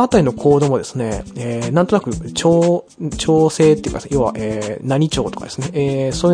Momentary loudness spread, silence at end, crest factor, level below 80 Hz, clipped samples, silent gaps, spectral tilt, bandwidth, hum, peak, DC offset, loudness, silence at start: 9 LU; 0 s; 16 dB; -38 dBFS; under 0.1%; none; -6 dB/octave; 10.5 kHz; none; 0 dBFS; under 0.1%; -17 LUFS; 0 s